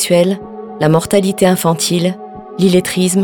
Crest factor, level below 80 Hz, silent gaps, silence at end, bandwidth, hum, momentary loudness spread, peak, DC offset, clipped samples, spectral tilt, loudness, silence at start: 14 dB; -50 dBFS; none; 0 s; 18.5 kHz; none; 12 LU; 0 dBFS; under 0.1%; under 0.1%; -5 dB/octave; -14 LUFS; 0 s